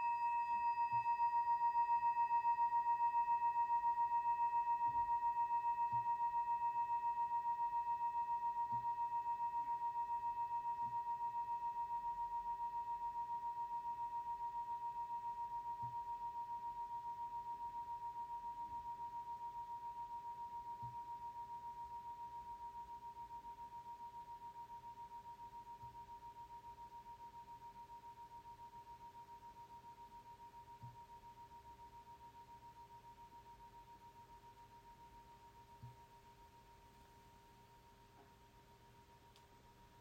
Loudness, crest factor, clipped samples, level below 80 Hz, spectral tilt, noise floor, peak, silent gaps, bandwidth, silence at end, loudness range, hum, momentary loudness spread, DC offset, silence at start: -42 LUFS; 14 dB; under 0.1%; -74 dBFS; -4.5 dB/octave; -66 dBFS; -30 dBFS; none; 14.5 kHz; 0 s; 23 LU; none; 22 LU; under 0.1%; 0 s